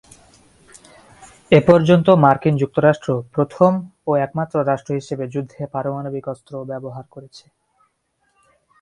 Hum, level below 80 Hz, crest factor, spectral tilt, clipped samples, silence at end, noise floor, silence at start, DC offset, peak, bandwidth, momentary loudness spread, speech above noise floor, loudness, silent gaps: none; -54 dBFS; 20 dB; -8 dB/octave; under 0.1%; 1.45 s; -67 dBFS; 1.5 s; under 0.1%; 0 dBFS; 11.5 kHz; 17 LU; 50 dB; -18 LUFS; none